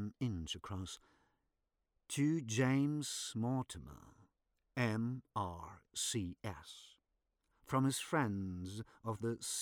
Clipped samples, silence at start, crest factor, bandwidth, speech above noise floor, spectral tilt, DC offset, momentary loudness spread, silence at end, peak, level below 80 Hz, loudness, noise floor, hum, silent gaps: under 0.1%; 0 s; 18 dB; 20 kHz; 47 dB; -5 dB/octave; under 0.1%; 15 LU; 0 s; -22 dBFS; -66 dBFS; -39 LUFS; -86 dBFS; none; none